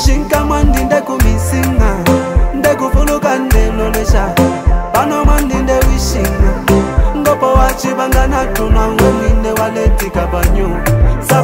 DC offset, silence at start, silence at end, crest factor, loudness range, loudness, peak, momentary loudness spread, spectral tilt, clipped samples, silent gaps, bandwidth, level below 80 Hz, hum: under 0.1%; 0 s; 0 s; 10 dB; 1 LU; -13 LUFS; 0 dBFS; 3 LU; -6 dB/octave; under 0.1%; none; 16.5 kHz; -14 dBFS; none